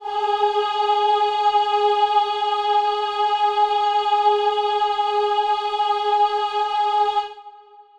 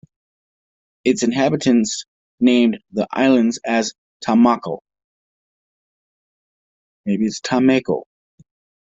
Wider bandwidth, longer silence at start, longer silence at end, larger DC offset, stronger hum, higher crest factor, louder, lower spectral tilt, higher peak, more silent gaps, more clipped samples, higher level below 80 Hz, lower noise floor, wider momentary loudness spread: about the same, 8.6 kHz vs 8 kHz; second, 0 s vs 1.05 s; second, 0.2 s vs 0.8 s; neither; neither; second, 12 dB vs 18 dB; about the same, -20 LUFS vs -18 LUFS; second, -1 dB/octave vs -5 dB/octave; second, -8 dBFS vs -2 dBFS; second, none vs 2.08-2.38 s, 3.98-4.20 s, 5.04-7.04 s; neither; about the same, -64 dBFS vs -60 dBFS; second, -46 dBFS vs under -90 dBFS; second, 3 LU vs 12 LU